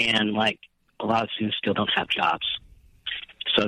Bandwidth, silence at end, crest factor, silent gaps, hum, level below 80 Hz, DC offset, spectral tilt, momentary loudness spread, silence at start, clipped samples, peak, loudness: 10.5 kHz; 0 s; 20 dB; none; none; -58 dBFS; under 0.1%; -4.5 dB/octave; 11 LU; 0 s; under 0.1%; -6 dBFS; -25 LUFS